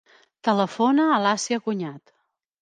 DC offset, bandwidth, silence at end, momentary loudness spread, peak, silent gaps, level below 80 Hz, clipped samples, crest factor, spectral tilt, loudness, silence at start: under 0.1%; 10 kHz; 0.65 s; 10 LU; -8 dBFS; none; -78 dBFS; under 0.1%; 16 dB; -4.5 dB/octave; -22 LUFS; 0.45 s